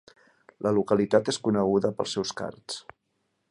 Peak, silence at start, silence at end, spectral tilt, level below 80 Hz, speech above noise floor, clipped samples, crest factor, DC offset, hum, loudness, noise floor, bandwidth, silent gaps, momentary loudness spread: -6 dBFS; 0.6 s; 0.7 s; -5 dB/octave; -62 dBFS; 50 dB; under 0.1%; 22 dB; under 0.1%; none; -26 LUFS; -76 dBFS; 11 kHz; none; 14 LU